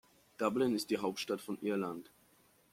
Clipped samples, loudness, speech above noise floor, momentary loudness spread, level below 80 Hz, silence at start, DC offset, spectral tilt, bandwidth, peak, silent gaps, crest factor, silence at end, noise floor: under 0.1%; -36 LUFS; 33 dB; 7 LU; -76 dBFS; 0.4 s; under 0.1%; -5 dB/octave; 16.5 kHz; -18 dBFS; none; 20 dB; 0.7 s; -68 dBFS